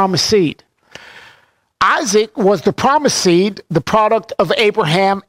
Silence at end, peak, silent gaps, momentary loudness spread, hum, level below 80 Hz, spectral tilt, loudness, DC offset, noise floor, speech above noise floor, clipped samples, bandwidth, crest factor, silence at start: 0.1 s; -2 dBFS; none; 4 LU; none; -50 dBFS; -4 dB/octave; -14 LUFS; under 0.1%; -52 dBFS; 39 dB; under 0.1%; 16 kHz; 12 dB; 0 s